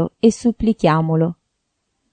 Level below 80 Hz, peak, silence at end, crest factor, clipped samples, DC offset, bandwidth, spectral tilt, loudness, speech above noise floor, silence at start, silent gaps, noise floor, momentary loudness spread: -44 dBFS; -2 dBFS; 0.8 s; 16 dB; under 0.1%; under 0.1%; 9.4 kHz; -7 dB/octave; -18 LUFS; 56 dB; 0 s; none; -73 dBFS; 4 LU